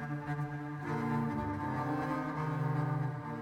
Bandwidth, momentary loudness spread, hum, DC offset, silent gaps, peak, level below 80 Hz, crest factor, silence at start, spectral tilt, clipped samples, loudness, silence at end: 10.5 kHz; 4 LU; none; under 0.1%; none; -24 dBFS; -60 dBFS; 12 dB; 0 s; -8.5 dB/octave; under 0.1%; -36 LUFS; 0 s